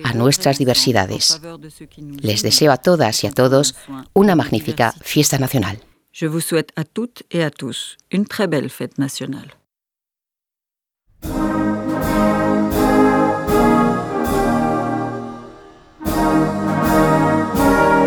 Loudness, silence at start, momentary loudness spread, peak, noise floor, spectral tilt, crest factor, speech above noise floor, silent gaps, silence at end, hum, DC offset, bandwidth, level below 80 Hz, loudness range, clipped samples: -17 LUFS; 0 s; 13 LU; 0 dBFS; -87 dBFS; -4.5 dB/octave; 18 dB; 69 dB; none; 0 s; none; under 0.1%; over 20 kHz; -38 dBFS; 9 LU; under 0.1%